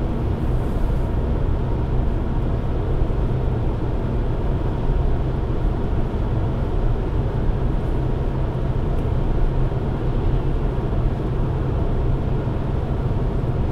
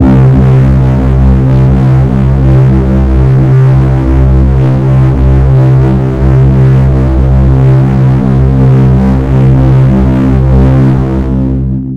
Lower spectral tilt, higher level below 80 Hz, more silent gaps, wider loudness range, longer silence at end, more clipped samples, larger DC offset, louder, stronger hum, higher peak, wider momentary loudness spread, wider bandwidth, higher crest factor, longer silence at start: about the same, -9.5 dB/octave vs -10.5 dB/octave; second, -22 dBFS vs -12 dBFS; neither; about the same, 0 LU vs 0 LU; about the same, 0 s vs 0 s; second, under 0.1% vs 0.3%; neither; second, -24 LUFS vs -7 LUFS; neither; second, -8 dBFS vs 0 dBFS; about the same, 1 LU vs 3 LU; first, 5.4 kHz vs 4.1 kHz; first, 12 dB vs 6 dB; about the same, 0 s vs 0 s